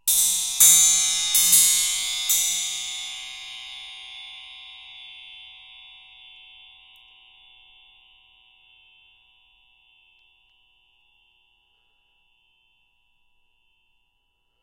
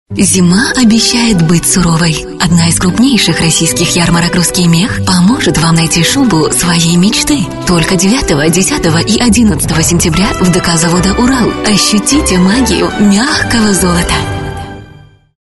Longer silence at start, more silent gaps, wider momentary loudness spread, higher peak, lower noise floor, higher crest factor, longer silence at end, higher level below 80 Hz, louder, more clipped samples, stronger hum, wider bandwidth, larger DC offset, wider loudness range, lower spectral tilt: about the same, 0.05 s vs 0.1 s; neither; first, 27 LU vs 3 LU; about the same, -2 dBFS vs 0 dBFS; first, -70 dBFS vs -37 dBFS; first, 24 dB vs 8 dB; first, 9.15 s vs 0.55 s; second, -64 dBFS vs -26 dBFS; second, -17 LUFS vs -8 LUFS; neither; neither; first, 16.5 kHz vs 12 kHz; neither; first, 27 LU vs 1 LU; second, 3.5 dB/octave vs -4 dB/octave